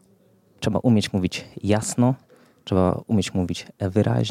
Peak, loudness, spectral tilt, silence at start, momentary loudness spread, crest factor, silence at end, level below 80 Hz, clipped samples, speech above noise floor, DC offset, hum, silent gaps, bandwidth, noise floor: -6 dBFS; -23 LUFS; -6 dB/octave; 0.6 s; 9 LU; 16 dB; 0 s; -52 dBFS; under 0.1%; 36 dB; under 0.1%; none; none; 14.5 kHz; -58 dBFS